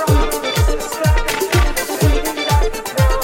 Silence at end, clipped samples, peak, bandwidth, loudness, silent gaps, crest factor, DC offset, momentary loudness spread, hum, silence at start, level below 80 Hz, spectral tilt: 0 s; under 0.1%; -2 dBFS; 17 kHz; -17 LUFS; none; 14 dB; under 0.1%; 3 LU; none; 0 s; -18 dBFS; -4.5 dB/octave